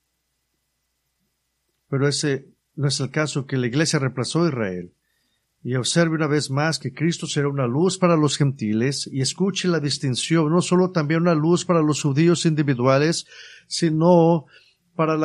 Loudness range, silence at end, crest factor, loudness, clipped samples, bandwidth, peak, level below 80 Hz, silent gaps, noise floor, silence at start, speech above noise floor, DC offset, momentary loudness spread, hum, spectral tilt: 5 LU; 0 s; 18 dB; -21 LUFS; under 0.1%; 11.5 kHz; -4 dBFS; -64 dBFS; none; -74 dBFS; 1.9 s; 53 dB; under 0.1%; 8 LU; none; -5.5 dB/octave